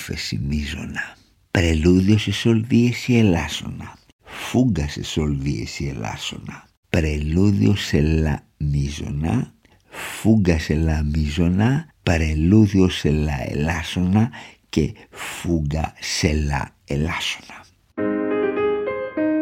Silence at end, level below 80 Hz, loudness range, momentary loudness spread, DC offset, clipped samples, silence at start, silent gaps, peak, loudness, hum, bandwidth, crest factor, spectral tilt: 0 s; -32 dBFS; 5 LU; 13 LU; under 0.1%; under 0.1%; 0 s; 4.12-4.19 s, 6.77-6.83 s; -2 dBFS; -21 LUFS; none; 16 kHz; 20 dB; -6 dB/octave